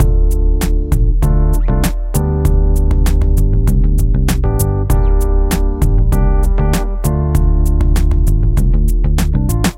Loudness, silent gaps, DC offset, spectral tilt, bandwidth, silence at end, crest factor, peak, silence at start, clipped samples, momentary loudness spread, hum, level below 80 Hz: -15 LUFS; none; under 0.1%; -6.5 dB/octave; 16 kHz; 0 s; 10 dB; -2 dBFS; 0 s; under 0.1%; 2 LU; none; -12 dBFS